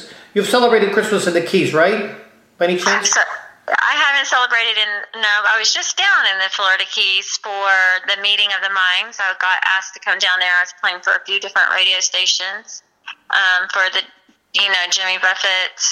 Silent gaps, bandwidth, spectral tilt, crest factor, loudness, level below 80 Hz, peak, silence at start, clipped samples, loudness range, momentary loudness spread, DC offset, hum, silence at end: none; 16 kHz; -1 dB/octave; 16 dB; -15 LUFS; -72 dBFS; -2 dBFS; 0 s; under 0.1%; 2 LU; 8 LU; under 0.1%; none; 0 s